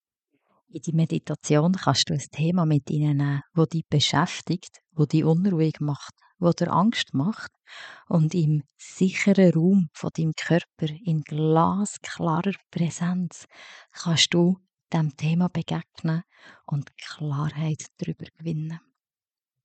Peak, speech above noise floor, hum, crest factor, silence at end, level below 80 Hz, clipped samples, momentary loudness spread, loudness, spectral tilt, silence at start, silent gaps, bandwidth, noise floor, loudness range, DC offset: -6 dBFS; over 66 dB; none; 20 dB; 0.85 s; -68 dBFS; under 0.1%; 13 LU; -24 LUFS; -6 dB/octave; 0.75 s; none; 9 kHz; under -90 dBFS; 6 LU; under 0.1%